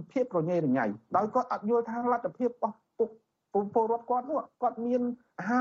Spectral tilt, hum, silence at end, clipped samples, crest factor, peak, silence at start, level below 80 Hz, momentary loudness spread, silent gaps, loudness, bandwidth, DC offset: -7.5 dB/octave; none; 0 s; under 0.1%; 16 dB; -14 dBFS; 0 s; -76 dBFS; 6 LU; none; -30 LUFS; 7.2 kHz; under 0.1%